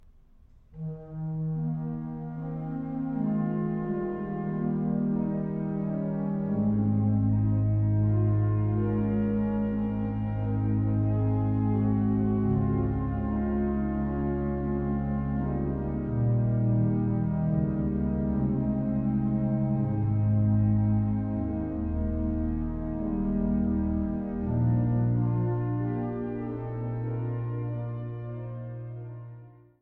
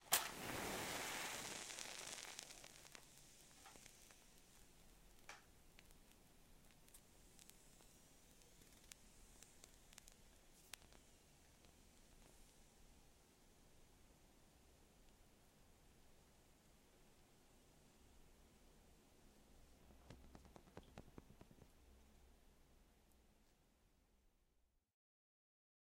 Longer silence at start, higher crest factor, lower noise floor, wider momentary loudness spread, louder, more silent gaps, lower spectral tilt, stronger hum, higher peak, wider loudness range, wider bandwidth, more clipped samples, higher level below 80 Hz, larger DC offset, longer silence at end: first, 0.7 s vs 0 s; second, 12 dB vs 42 dB; second, -55 dBFS vs -82 dBFS; second, 9 LU vs 23 LU; first, -28 LUFS vs -51 LUFS; neither; first, -13 dB/octave vs -1.5 dB/octave; neither; about the same, -14 dBFS vs -16 dBFS; second, 5 LU vs 18 LU; second, 3 kHz vs 16 kHz; neither; first, -40 dBFS vs -72 dBFS; neither; second, 0.3 s vs 1.35 s